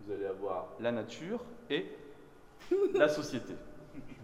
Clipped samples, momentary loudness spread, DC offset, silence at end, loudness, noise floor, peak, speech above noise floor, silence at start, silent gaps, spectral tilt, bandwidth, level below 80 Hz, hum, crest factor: under 0.1%; 22 LU; 0.1%; 0 s; -35 LUFS; -56 dBFS; -14 dBFS; 22 dB; 0 s; none; -5 dB/octave; 13.5 kHz; -62 dBFS; none; 22 dB